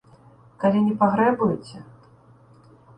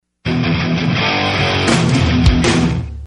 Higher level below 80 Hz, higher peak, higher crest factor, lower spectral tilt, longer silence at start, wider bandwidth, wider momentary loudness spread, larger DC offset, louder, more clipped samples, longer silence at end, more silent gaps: second, -62 dBFS vs -24 dBFS; second, -6 dBFS vs 0 dBFS; first, 20 dB vs 14 dB; first, -8.5 dB/octave vs -5.5 dB/octave; first, 0.6 s vs 0.25 s; second, 9.4 kHz vs 11.5 kHz; first, 19 LU vs 5 LU; neither; second, -21 LUFS vs -15 LUFS; neither; first, 1.15 s vs 0 s; neither